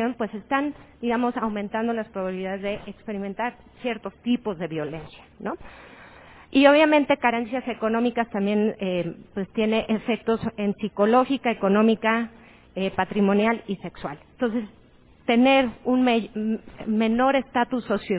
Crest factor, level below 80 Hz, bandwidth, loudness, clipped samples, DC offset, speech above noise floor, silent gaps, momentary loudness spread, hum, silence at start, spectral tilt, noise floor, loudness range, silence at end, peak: 20 dB; -56 dBFS; 4 kHz; -24 LUFS; under 0.1%; under 0.1%; 24 dB; none; 14 LU; none; 0 s; -10 dB/octave; -48 dBFS; 8 LU; 0 s; -4 dBFS